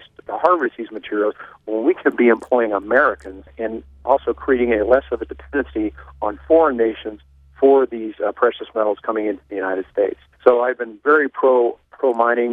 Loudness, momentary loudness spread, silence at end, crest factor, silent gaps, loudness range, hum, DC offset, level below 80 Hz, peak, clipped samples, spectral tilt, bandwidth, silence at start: -19 LUFS; 12 LU; 0 s; 18 dB; none; 2 LU; none; under 0.1%; -46 dBFS; 0 dBFS; under 0.1%; -7.5 dB/octave; 4.8 kHz; 0.3 s